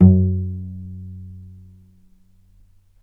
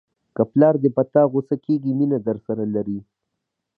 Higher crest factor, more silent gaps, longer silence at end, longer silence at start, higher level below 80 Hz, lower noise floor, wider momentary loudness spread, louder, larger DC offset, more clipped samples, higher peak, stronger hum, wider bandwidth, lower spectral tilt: about the same, 20 dB vs 18 dB; neither; first, 1.6 s vs 0.75 s; second, 0 s vs 0.4 s; first, -42 dBFS vs -64 dBFS; second, -52 dBFS vs -80 dBFS; first, 24 LU vs 10 LU; about the same, -21 LUFS vs -20 LUFS; neither; neither; about the same, 0 dBFS vs -2 dBFS; neither; second, 1.4 kHz vs 4.6 kHz; first, -14 dB/octave vs -12.5 dB/octave